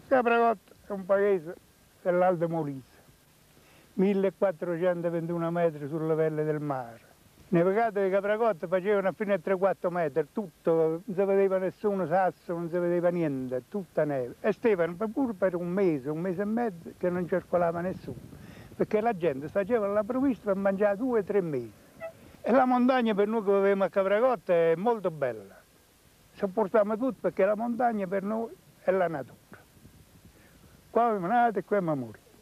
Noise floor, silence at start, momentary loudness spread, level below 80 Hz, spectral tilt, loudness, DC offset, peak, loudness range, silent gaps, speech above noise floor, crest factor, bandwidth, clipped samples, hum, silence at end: -60 dBFS; 0.1 s; 11 LU; -66 dBFS; -8 dB/octave; -28 LUFS; under 0.1%; -12 dBFS; 4 LU; none; 33 dB; 16 dB; 15 kHz; under 0.1%; none; 0.3 s